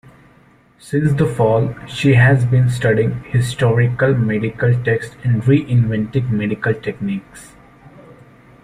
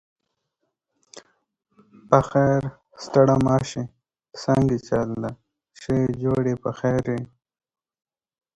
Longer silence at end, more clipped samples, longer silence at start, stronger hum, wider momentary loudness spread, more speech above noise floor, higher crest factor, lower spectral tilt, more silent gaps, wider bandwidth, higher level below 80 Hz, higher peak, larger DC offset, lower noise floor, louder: second, 0.5 s vs 1.3 s; neither; second, 0.85 s vs 1.15 s; neither; second, 9 LU vs 17 LU; second, 35 dB vs 56 dB; second, 16 dB vs 24 dB; about the same, -7.5 dB/octave vs -7.5 dB/octave; neither; about the same, 11 kHz vs 10 kHz; about the same, -46 dBFS vs -50 dBFS; about the same, -2 dBFS vs 0 dBFS; neither; second, -50 dBFS vs -78 dBFS; first, -17 LUFS vs -22 LUFS